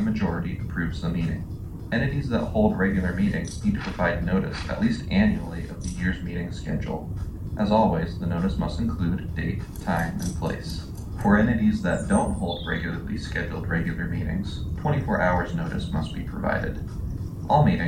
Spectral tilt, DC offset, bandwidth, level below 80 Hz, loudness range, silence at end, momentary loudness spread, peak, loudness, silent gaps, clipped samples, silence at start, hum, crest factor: -7 dB/octave; under 0.1%; 16 kHz; -36 dBFS; 2 LU; 0 s; 10 LU; -6 dBFS; -26 LUFS; none; under 0.1%; 0 s; none; 18 dB